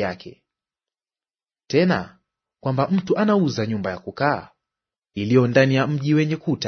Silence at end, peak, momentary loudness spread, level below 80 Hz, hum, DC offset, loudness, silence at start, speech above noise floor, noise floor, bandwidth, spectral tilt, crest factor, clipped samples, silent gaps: 0 s; -2 dBFS; 12 LU; -60 dBFS; none; under 0.1%; -21 LUFS; 0 s; over 70 dB; under -90 dBFS; 6.6 kHz; -7 dB/octave; 20 dB; under 0.1%; none